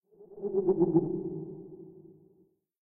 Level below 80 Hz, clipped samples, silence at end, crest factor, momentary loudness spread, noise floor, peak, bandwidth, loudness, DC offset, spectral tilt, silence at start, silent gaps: -68 dBFS; under 0.1%; 0.75 s; 20 dB; 23 LU; -67 dBFS; -12 dBFS; 1.7 kHz; -30 LUFS; under 0.1%; -15 dB/octave; 0.2 s; none